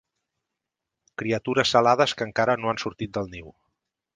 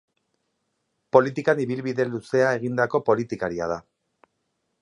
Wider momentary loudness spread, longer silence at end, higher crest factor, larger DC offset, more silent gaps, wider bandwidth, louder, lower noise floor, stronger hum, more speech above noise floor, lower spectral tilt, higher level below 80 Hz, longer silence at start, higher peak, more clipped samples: first, 15 LU vs 8 LU; second, 0.65 s vs 1 s; about the same, 22 dB vs 24 dB; neither; neither; second, 9.8 kHz vs 11 kHz; about the same, -24 LUFS vs -24 LUFS; first, -85 dBFS vs -76 dBFS; neither; first, 61 dB vs 53 dB; second, -4.5 dB/octave vs -7 dB/octave; about the same, -58 dBFS vs -62 dBFS; about the same, 1.2 s vs 1.15 s; about the same, -4 dBFS vs -2 dBFS; neither